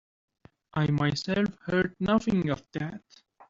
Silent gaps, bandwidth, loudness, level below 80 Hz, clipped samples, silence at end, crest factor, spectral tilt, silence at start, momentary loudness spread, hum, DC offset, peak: none; 7.8 kHz; -28 LUFS; -56 dBFS; under 0.1%; 0.5 s; 16 dB; -6.5 dB/octave; 0.75 s; 10 LU; none; under 0.1%; -12 dBFS